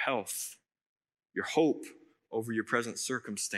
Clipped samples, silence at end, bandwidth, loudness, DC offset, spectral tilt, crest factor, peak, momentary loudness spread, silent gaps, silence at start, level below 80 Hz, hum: under 0.1%; 0 s; 16 kHz; -33 LUFS; under 0.1%; -3.5 dB/octave; 20 dB; -14 dBFS; 11 LU; 0.86-0.96 s; 0 s; -90 dBFS; none